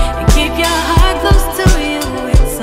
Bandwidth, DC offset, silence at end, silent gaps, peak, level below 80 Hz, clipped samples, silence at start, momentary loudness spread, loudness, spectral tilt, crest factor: 16 kHz; under 0.1%; 0 s; none; 0 dBFS; -14 dBFS; under 0.1%; 0 s; 4 LU; -13 LUFS; -4.5 dB/octave; 10 dB